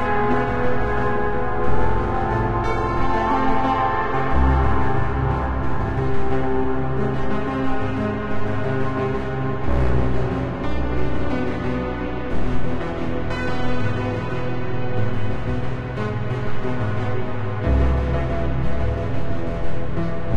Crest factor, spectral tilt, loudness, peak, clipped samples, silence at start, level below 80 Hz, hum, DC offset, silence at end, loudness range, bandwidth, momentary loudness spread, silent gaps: 12 dB; -8.5 dB/octave; -23 LUFS; -6 dBFS; under 0.1%; 0 s; -28 dBFS; none; under 0.1%; 0 s; 4 LU; 8 kHz; 6 LU; none